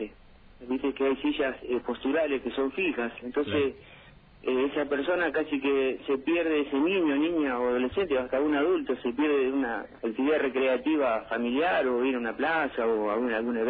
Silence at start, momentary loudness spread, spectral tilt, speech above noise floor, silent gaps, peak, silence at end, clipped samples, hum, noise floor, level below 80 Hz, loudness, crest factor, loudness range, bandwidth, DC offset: 0 s; 6 LU; -8.5 dB/octave; 26 dB; none; -14 dBFS; 0 s; under 0.1%; none; -53 dBFS; -58 dBFS; -28 LUFS; 14 dB; 3 LU; 4.8 kHz; under 0.1%